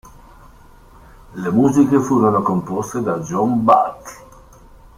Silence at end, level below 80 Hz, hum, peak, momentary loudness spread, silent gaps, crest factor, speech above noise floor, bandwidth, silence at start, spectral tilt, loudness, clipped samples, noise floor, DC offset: 0.8 s; -48 dBFS; none; -2 dBFS; 13 LU; none; 18 dB; 28 dB; 15 kHz; 1.3 s; -7.5 dB/octave; -17 LUFS; under 0.1%; -44 dBFS; under 0.1%